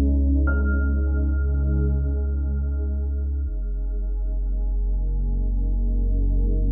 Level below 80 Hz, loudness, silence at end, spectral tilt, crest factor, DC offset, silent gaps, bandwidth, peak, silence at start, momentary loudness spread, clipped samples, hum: -22 dBFS; -25 LUFS; 0 s; -13 dB/octave; 10 dB; under 0.1%; none; 1.6 kHz; -12 dBFS; 0 s; 7 LU; under 0.1%; none